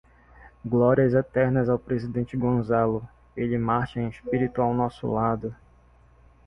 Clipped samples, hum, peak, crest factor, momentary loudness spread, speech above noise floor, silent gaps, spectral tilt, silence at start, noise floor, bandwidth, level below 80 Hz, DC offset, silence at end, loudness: under 0.1%; none; -8 dBFS; 18 dB; 10 LU; 32 dB; none; -10 dB/octave; 0.4 s; -56 dBFS; 5.8 kHz; -50 dBFS; under 0.1%; 0.9 s; -25 LUFS